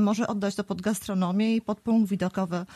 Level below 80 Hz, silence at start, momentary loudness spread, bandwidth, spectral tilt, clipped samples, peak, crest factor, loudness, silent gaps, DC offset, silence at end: -62 dBFS; 0 s; 5 LU; 13.5 kHz; -6 dB/octave; under 0.1%; -14 dBFS; 12 dB; -27 LUFS; none; under 0.1%; 0 s